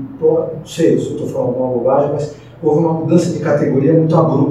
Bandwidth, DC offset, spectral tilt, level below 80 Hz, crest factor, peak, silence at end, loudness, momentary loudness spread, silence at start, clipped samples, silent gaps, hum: 12 kHz; 0.1%; -8 dB/octave; -50 dBFS; 14 dB; 0 dBFS; 0 s; -15 LUFS; 8 LU; 0 s; under 0.1%; none; none